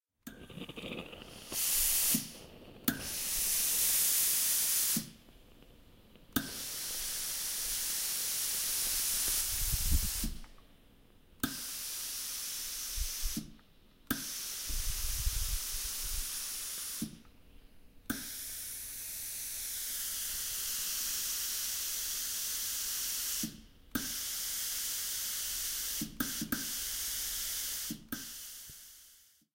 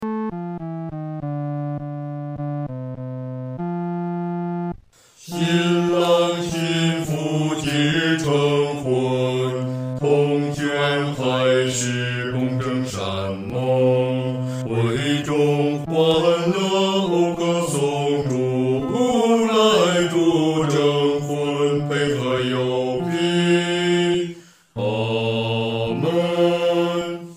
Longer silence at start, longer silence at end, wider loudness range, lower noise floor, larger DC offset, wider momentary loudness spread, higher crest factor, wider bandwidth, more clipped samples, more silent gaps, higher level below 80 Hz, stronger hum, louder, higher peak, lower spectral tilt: first, 0.25 s vs 0 s; first, 0.35 s vs 0 s; about the same, 9 LU vs 9 LU; first, -62 dBFS vs -49 dBFS; neither; first, 15 LU vs 10 LU; first, 24 dB vs 16 dB; about the same, 16 kHz vs 16 kHz; neither; neither; first, -46 dBFS vs -56 dBFS; neither; second, -33 LUFS vs -21 LUFS; second, -14 dBFS vs -4 dBFS; second, -1 dB/octave vs -5.5 dB/octave